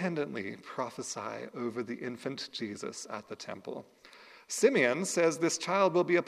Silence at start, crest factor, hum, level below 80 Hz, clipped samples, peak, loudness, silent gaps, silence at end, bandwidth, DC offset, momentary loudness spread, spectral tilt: 0 s; 20 dB; none; -80 dBFS; under 0.1%; -12 dBFS; -32 LUFS; none; 0 s; 14.5 kHz; under 0.1%; 15 LU; -4 dB/octave